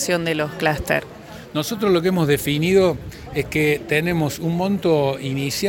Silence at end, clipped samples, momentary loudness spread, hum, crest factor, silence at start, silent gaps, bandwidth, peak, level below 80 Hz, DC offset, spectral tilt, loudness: 0 s; under 0.1%; 9 LU; none; 16 dB; 0 s; none; 17 kHz; -4 dBFS; -44 dBFS; under 0.1%; -5 dB/octave; -20 LUFS